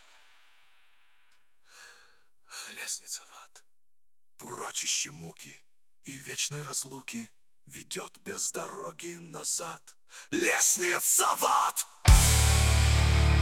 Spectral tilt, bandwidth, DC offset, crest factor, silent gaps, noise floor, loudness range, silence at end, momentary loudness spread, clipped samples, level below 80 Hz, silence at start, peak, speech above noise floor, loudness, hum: -3 dB/octave; 17.5 kHz; under 0.1%; 22 dB; none; -87 dBFS; 19 LU; 0 s; 23 LU; under 0.1%; -34 dBFS; 1.8 s; -8 dBFS; 54 dB; -27 LUFS; none